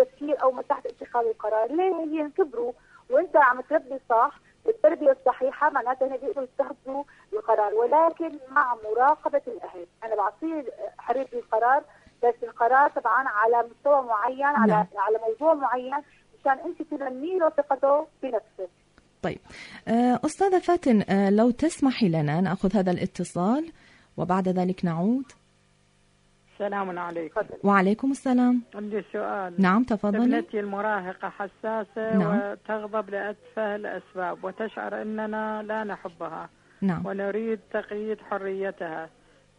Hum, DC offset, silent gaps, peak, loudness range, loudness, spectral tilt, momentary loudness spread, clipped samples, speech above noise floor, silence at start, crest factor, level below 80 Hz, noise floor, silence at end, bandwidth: 50 Hz at -55 dBFS; under 0.1%; none; -8 dBFS; 8 LU; -25 LUFS; -7 dB/octave; 12 LU; under 0.1%; 38 dB; 0 s; 18 dB; -62 dBFS; -63 dBFS; 0.5 s; 10.5 kHz